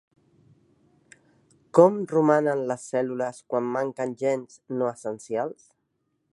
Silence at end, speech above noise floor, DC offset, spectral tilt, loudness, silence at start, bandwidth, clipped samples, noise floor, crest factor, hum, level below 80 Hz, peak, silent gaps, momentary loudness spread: 0.8 s; 51 dB; under 0.1%; -7 dB/octave; -25 LUFS; 1.75 s; 11.5 kHz; under 0.1%; -75 dBFS; 24 dB; none; -76 dBFS; -2 dBFS; none; 12 LU